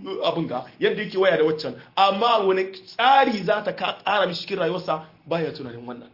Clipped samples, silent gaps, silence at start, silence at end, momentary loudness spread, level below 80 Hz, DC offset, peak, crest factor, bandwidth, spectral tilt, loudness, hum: under 0.1%; none; 0 s; 0.1 s; 12 LU; -68 dBFS; under 0.1%; -6 dBFS; 16 dB; 5.8 kHz; -6 dB/octave; -22 LUFS; none